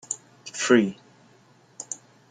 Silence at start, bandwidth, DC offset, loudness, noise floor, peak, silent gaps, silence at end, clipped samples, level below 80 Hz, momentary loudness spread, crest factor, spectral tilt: 0.1 s; 9.6 kHz; under 0.1%; -25 LUFS; -57 dBFS; -6 dBFS; none; 0.35 s; under 0.1%; -70 dBFS; 18 LU; 22 dB; -3.5 dB/octave